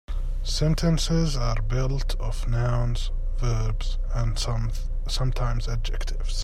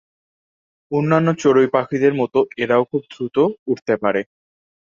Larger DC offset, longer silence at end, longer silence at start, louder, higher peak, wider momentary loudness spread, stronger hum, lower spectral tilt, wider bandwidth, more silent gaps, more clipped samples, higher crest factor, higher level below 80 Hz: neither; second, 0 s vs 0.75 s; second, 0.1 s vs 0.9 s; second, -27 LUFS vs -18 LUFS; second, -10 dBFS vs -2 dBFS; about the same, 8 LU vs 9 LU; neither; second, -5.5 dB/octave vs -7 dB/octave; first, 12 kHz vs 7.4 kHz; second, none vs 3.59-3.66 s; neither; about the same, 14 dB vs 18 dB; first, -26 dBFS vs -62 dBFS